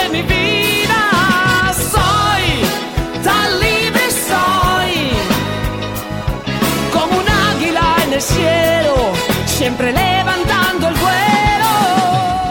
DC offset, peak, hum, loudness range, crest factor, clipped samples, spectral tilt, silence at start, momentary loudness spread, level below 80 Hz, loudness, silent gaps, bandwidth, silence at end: under 0.1%; -2 dBFS; none; 2 LU; 12 dB; under 0.1%; -4 dB/octave; 0 s; 5 LU; -28 dBFS; -14 LUFS; none; 17 kHz; 0 s